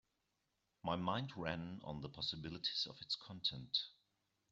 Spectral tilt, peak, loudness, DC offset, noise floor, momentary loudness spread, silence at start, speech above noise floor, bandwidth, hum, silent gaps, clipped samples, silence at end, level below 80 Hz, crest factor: -3 dB/octave; -24 dBFS; -42 LUFS; under 0.1%; -86 dBFS; 9 LU; 0.85 s; 42 dB; 8 kHz; none; none; under 0.1%; 0.6 s; -70 dBFS; 22 dB